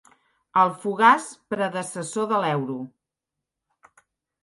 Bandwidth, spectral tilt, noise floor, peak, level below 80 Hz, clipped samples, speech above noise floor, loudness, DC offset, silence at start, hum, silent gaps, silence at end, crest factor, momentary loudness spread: 11.5 kHz; -4.5 dB/octave; -86 dBFS; -4 dBFS; -76 dBFS; under 0.1%; 63 dB; -23 LUFS; under 0.1%; 0.55 s; none; none; 1.55 s; 20 dB; 14 LU